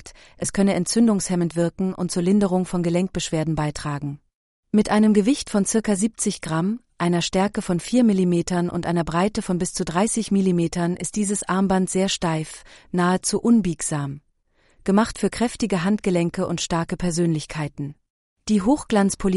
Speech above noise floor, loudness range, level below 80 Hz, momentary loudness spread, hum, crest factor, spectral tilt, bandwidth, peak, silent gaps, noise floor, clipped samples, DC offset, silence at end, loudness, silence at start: 41 dB; 2 LU; -46 dBFS; 10 LU; none; 16 dB; -5.5 dB/octave; 11.5 kHz; -6 dBFS; 4.34-4.63 s, 18.10-18.36 s; -62 dBFS; under 0.1%; under 0.1%; 0 s; -22 LUFS; 0.05 s